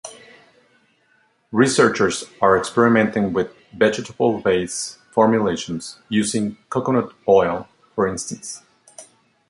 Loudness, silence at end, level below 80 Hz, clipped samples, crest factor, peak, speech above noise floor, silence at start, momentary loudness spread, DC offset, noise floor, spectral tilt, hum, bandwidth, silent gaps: -20 LUFS; 0.45 s; -54 dBFS; under 0.1%; 18 dB; -2 dBFS; 42 dB; 0.05 s; 13 LU; under 0.1%; -61 dBFS; -4.5 dB/octave; none; 11.5 kHz; none